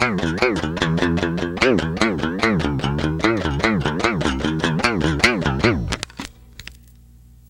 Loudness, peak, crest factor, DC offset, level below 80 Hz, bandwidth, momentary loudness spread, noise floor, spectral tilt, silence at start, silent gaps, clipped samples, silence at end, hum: -20 LUFS; 0 dBFS; 20 dB; under 0.1%; -34 dBFS; 16.5 kHz; 12 LU; -46 dBFS; -5.5 dB/octave; 0 s; none; under 0.1%; 0.75 s; none